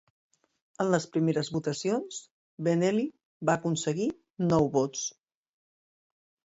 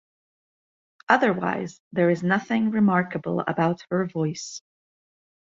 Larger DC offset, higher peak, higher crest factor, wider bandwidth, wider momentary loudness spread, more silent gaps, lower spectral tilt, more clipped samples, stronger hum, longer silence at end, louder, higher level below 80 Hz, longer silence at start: neither; second, -12 dBFS vs -2 dBFS; about the same, 18 dB vs 22 dB; about the same, 8 kHz vs 7.8 kHz; about the same, 9 LU vs 11 LU; first, 2.31-2.58 s, 3.25-3.40 s, 4.30-4.34 s vs 1.80-1.91 s; about the same, -5.5 dB/octave vs -6.5 dB/octave; neither; neither; first, 1.35 s vs 0.85 s; second, -29 LUFS vs -24 LUFS; about the same, -66 dBFS vs -66 dBFS; second, 0.8 s vs 1.1 s